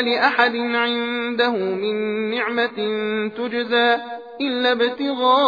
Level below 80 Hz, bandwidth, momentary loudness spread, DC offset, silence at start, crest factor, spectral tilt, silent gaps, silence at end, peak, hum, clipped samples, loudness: -74 dBFS; 5 kHz; 7 LU; under 0.1%; 0 s; 18 dB; -5.5 dB/octave; none; 0 s; -2 dBFS; none; under 0.1%; -20 LUFS